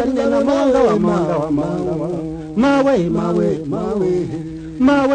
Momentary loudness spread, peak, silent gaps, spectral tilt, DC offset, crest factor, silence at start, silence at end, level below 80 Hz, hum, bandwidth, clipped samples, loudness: 10 LU; -4 dBFS; none; -7.5 dB/octave; under 0.1%; 12 dB; 0 s; 0 s; -42 dBFS; none; 9.4 kHz; under 0.1%; -17 LUFS